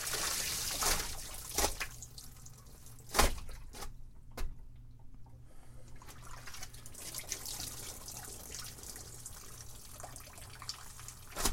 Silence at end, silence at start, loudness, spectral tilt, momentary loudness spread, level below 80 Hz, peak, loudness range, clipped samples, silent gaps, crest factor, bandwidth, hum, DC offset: 0 s; 0 s; -39 LUFS; -1.5 dB/octave; 24 LU; -46 dBFS; -12 dBFS; 14 LU; under 0.1%; none; 28 dB; 16.5 kHz; none; under 0.1%